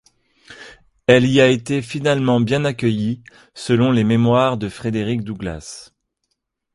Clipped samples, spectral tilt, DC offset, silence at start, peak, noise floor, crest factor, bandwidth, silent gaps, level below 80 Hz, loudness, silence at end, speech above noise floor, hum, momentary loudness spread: under 0.1%; -6.5 dB/octave; under 0.1%; 0.5 s; 0 dBFS; -74 dBFS; 18 dB; 11.5 kHz; none; -48 dBFS; -18 LUFS; 0.9 s; 57 dB; none; 15 LU